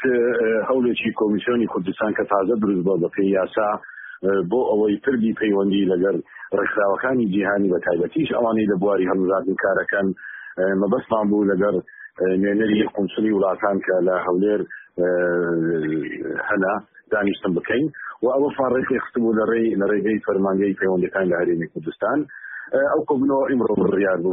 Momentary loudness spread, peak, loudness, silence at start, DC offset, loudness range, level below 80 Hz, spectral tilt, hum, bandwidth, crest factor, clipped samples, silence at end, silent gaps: 6 LU; -6 dBFS; -21 LUFS; 0 s; under 0.1%; 2 LU; -58 dBFS; -3 dB/octave; none; 3.8 kHz; 14 dB; under 0.1%; 0 s; none